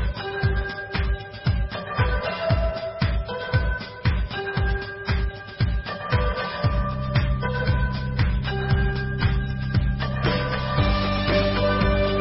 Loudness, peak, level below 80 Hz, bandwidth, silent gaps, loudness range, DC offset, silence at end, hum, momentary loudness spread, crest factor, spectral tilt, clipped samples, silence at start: -25 LUFS; -8 dBFS; -28 dBFS; 5.8 kHz; none; 3 LU; under 0.1%; 0 s; none; 6 LU; 16 dB; -10.5 dB/octave; under 0.1%; 0 s